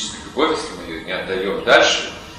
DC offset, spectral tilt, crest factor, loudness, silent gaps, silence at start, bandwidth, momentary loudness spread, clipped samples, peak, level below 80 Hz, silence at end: under 0.1%; -2.5 dB/octave; 20 dB; -18 LUFS; none; 0 s; 14.5 kHz; 13 LU; under 0.1%; 0 dBFS; -46 dBFS; 0 s